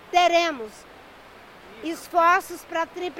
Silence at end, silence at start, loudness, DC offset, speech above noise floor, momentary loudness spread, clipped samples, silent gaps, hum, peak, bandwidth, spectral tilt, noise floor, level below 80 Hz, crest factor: 0 s; 0.1 s; -22 LUFS; under 0.1%; 24 dB; 17 LU; under 0.1%; none; none; -6 dBFS; 16 kHz; -2 dB/octave; -47 dBFS; -60 dBFS; 20 dB